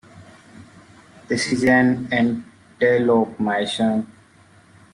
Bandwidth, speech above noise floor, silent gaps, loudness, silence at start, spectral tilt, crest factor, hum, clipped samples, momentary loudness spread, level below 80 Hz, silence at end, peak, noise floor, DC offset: 11 kHz; 33 dB; none; -20 LUFS; 0.15 s; -5.5 dB/octave; 16 dB; none; under 0.1%; 10 LU; -58 dBFS; 0.9 s; -4 dBFS; -51 dBFS; under 0.1%